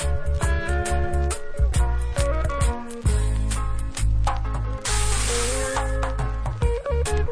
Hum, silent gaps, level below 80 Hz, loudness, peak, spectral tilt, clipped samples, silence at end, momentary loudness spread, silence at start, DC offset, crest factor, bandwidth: none; none; -24 dBFS; -25 LUFS; -6 dBFS; -4.5 dB/octave; under 0.1%; 0 s; 5 LU; 0 s; under 0.1%; 16 dB; 11 kHz